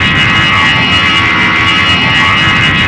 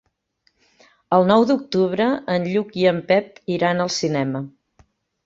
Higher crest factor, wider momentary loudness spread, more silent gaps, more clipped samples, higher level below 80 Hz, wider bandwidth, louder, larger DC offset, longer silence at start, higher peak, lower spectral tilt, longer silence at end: second, 8 dB vs 20 dB; second, 1 LU vs 9 LU; neither; neither; first, -30 dBFS vs -62 dBFS; first, 10.5 kHz vs 7.8 kHz; first, -6 LUFS vs -20 LUFS; neither; second, 0 s vs 1.1 s; about the same, 0 dBFS vs -2 dBFS; second, -3.5 dB/octave vs -5.5 dB/octave; second, 0 s vs 0.75 s